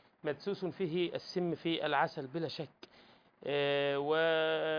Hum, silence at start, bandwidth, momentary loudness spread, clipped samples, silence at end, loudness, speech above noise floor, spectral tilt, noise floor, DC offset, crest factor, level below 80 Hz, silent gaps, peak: none; 0.25 s; 5.4 kHz; 10 LU; under 0.1%; 0 s; -34 LUFS; 29 dB; -6.5 dB/octave; -63 dBFS; under 0.1%; 18 dB; -80 dBFS; none; -18 dBFS